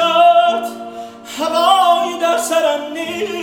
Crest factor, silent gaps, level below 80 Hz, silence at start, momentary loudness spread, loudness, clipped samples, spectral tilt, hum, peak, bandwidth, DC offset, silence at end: 14 dB; none; -64 dBFS; 0 s; 19 LU; -14 LUFS; under 0.1%; -2 dB/octave; none; 0 dBFS; 17 kHz; under 0.1%; 0 s